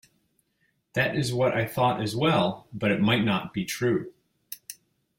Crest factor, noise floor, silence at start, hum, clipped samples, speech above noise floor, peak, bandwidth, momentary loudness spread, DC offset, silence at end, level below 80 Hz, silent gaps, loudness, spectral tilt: 18 dB; -72 dBFS; 0.95 s; none; under 0.1%; 47 dB; -8 dBFS; 16.5 kHz; 18 LU; under 0.1%; 0.45 s; -60 dBFS; none; -26 LUFS; -5.5 dB/octave